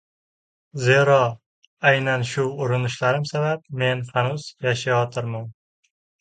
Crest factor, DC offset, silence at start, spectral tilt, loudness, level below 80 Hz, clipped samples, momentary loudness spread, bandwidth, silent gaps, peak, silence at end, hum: 20 dB; under 0.1%; 0.75 s; -5.5 dB/octave; -22 LUFS; -62 dBFS; under 0.1%; 11 LU; 9.2 kHz; 1.46-1.77 s; -2 dBFS; 0.7 s; none